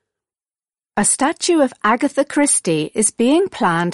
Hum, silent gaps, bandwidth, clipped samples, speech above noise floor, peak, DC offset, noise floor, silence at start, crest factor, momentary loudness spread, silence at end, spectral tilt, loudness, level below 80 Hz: none; none; 11.5 kHz; under 0.1%; over 73 dB; -2 dBFS; under 0.1%; under -90 dBFS; 0.95 s; 14 dB; 3 LU; 0 s; -3.5 dB/octave; -16 LUFS; -56 dBFS